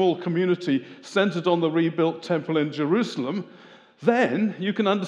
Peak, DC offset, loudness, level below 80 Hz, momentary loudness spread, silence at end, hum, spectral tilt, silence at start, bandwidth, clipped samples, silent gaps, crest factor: -4 dBFS; under 0.1%; -24 LUFS; -86 dBFS; 6 LU; 0 s; none; -6.5 dB/octave; 0 s; 10 kHz; under 0.1%; none; 18 dB